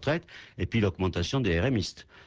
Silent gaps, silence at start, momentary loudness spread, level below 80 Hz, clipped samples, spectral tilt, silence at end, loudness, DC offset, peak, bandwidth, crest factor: none; 0 s; 10 LU; -42 dBFS; under 0.1%; -6 dB/octave; 0.05 s; -29 LUFS; under 0.1%; -14 dBFS; 8 kHz; 14 dB